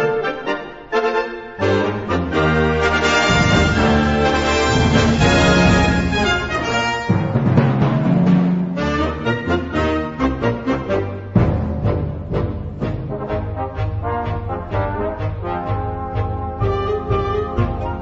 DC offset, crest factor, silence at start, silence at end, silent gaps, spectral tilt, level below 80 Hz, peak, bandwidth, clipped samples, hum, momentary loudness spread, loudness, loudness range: under 0.1%; 16 dB; 0 s; 0 s; none; -6 dB/octave; -30 dBFS; 0 dBFS; 8 kHz; under 0.1%; none; 10 LU; -18 LUFS; 9 LU